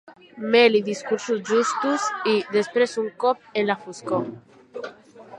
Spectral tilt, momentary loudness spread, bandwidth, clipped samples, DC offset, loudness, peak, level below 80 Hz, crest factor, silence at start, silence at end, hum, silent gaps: -4 dB/octave; 18 LU; 10.5 kHz; under 0.1%; under 0.1%; -22 LUFS; -4 dBFS; -74 dBFS; 20 dB; 0.1 s; 0 s; none; none